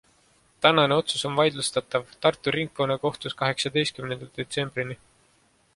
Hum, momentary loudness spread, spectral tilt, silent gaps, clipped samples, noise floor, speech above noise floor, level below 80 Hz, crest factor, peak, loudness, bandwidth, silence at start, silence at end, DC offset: none; 12 LU; -4 dB/octave; none; under 0.1%; -64 dBFS; 38 dB; -62 dBFS; 24 dB; -2 dBFS; -25 LUFS; 11.5 kHz; 0.6 s; 0.8 s; under 0.1%